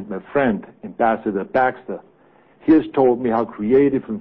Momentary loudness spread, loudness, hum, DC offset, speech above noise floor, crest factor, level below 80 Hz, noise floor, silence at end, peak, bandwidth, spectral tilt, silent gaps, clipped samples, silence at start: 14 LU; -19 LUFS; none; 0.1%; 35 dB; 14 dB; -54 dBFS; -53 dBFS; 0 s; -4 dBFS; 5 kHz; -10.5 dB/octave; none; under 0.1%; 0 s